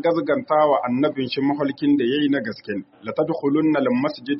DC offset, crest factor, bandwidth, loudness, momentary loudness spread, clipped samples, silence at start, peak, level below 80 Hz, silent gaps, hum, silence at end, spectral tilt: under 0.1%; 14 dB; 5.8 kHz; -21 LUFS; 10 LU; under 0.1%; 0 s; -6 dBFS; -66 dBFS; none; none; 0 s; -4.5 dB/octave